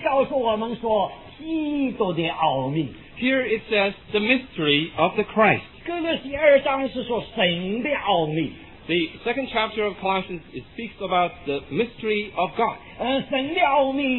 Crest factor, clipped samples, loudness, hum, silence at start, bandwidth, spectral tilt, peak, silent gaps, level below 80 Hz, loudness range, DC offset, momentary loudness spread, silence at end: 20 dB; under 0.1%; -23 LUFS; none; 0 s; 4.2 kHz; -8.5 dB/octave; -2 dBFS; none; -52 dBFS; 5 LU; under 0.1%; 10 LU; 0 s